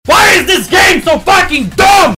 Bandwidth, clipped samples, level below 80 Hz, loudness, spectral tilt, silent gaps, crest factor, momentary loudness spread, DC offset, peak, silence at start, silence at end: 16 kHz; under 0.1%; -30 dBFS; -7 LUFS; -2.5 dB/octave; none; 8 dB; 4 LU; under 0.1%; 0 dBFS; 0.05 s; 0 s